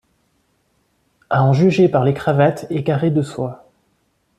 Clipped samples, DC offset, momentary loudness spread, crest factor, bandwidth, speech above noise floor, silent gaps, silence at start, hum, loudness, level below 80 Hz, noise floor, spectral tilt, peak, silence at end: under 0.1%; under 0.1%; 10 LU; 16 dB; 10 kHz; 49 dB; none; 1.3 s; none; -17 LUFS; -54 dBFS; -64 dBFS; -8 dB/octave; -2 dBFS; 0.85 s